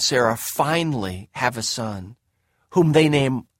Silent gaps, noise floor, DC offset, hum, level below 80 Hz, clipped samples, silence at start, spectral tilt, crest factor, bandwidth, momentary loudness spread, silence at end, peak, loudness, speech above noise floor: none; -69 dBFS; under 0.1%; none; -54 dBFS; under 0.1%; 0 s; -4.5 dB/octave; 18 dB; 16.5 kHz; 12 LU; 0.15 s; -4 dBFS; -21 LUFS; 48 dB